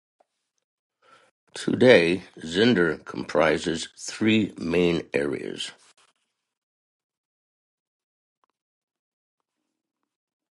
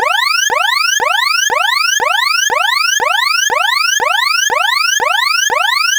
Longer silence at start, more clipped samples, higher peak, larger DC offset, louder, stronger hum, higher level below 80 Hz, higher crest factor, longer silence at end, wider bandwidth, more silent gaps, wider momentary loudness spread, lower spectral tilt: first, 1.55 s vs 0 s; neither; about the same, -2 dBFS vs -2 dBFS; neither; second, -23 LUFS vs -11 LUFS; neither; about the same, -58 dBFS vs -58 dBFS; first, 24 dB vs 12 dB; first, 4.8 s vs 0 s; second, 11.5 kHz vs over 20 kHz; neither; first, 16 LU vs 1 LU; first, -5 dB/octave vs 2.5 dB/octave